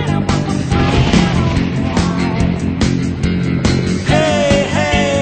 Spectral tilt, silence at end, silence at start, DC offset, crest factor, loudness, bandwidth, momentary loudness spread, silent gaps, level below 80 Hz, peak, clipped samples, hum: -6 dB/octave; 0 s; 0 s; under 0.1%; 14 dB; -15 LUFS; 9.2 kHz; 4 LU; none; -26 dBFS; 0 dBFS; under 0.1%; none